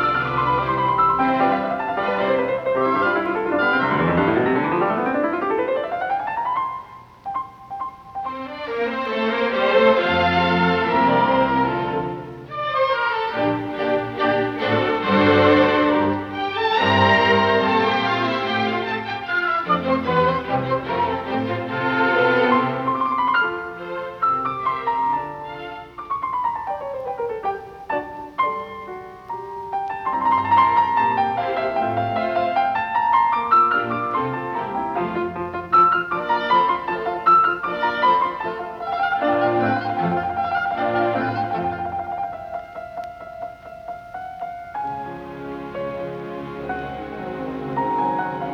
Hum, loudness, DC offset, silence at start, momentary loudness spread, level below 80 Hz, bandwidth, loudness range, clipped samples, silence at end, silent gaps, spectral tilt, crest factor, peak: none; -20 LUFS; under 0.1%; 0 s; 15 LU; -54 dBFS; 7.6 kHz; 9 LU; under 0.1%; 0 s; none; -7 dB/octave; 18 dB; -2 dBFS